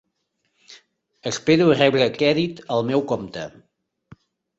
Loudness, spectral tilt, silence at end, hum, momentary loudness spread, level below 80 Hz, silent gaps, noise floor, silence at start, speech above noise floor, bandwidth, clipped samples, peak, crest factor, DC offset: -20 LUFS; -5.5 dB/octave; 1.1 s; none; 16 LU; -60 dBFS; none; -73 dBFS; 0.7 s; 53 dB; 8 kHz; under 0.1%; -2 dBFS; 22 dB; under 0.1%